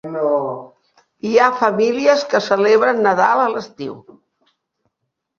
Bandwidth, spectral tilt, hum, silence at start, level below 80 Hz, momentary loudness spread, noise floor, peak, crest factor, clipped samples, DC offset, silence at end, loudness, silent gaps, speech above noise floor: 7.2 kHz; -4.5 dB/octave; none; 0.05 s; -64 dBFS; 16 LU; -76 dBFS; 0 dBFS; 18 dB; under 0.1%; under 0.1%; 1.4 s; -16 LUFS; none; 60 dB